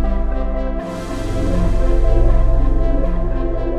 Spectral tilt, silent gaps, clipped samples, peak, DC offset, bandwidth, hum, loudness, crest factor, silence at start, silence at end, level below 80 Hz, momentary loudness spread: -8 dB/octave; none; under 0.1%; -2 dBFS; under 0.1%; 7.6 kHz; none; -20 LUFS; 12 dB; 0 s; 0 s; -16 dBFS; 7 LU